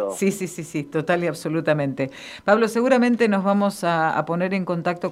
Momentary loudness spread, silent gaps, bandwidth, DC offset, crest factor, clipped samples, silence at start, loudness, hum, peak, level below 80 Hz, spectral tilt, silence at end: 10 LU; none; 15.5 kHz; under 0.1%; 18 dB; under 0.1%; 0 s; -22 LUFS; none; -4 dBFS; -64 dBFS; -6 dB/octave; 0 s